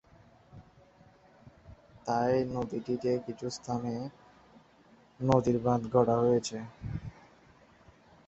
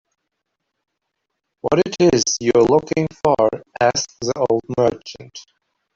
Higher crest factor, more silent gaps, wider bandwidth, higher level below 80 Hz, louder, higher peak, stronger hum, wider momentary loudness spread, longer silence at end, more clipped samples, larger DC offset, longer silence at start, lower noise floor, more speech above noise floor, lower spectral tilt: first, 24 dB vs 16 dB; neither; about the same, 8.2 kHz vs 7.8 kHz; second, -58 dBFS vs -52 dBFS; second, -31 LUFS vs -18 LUFS; second, -10 dBFS vs -4 dBFS; neither; about the same, 14 LU vs 14 LU; first, 1.15 s vs 0.55 s; neither; neither; second, 0.55 s vs 1.65 s; second, -61 dBFS vs -77 dBFS; second, 31 dB vs 59 dB; first, -7 dB/octave vs -4.5 dB/octave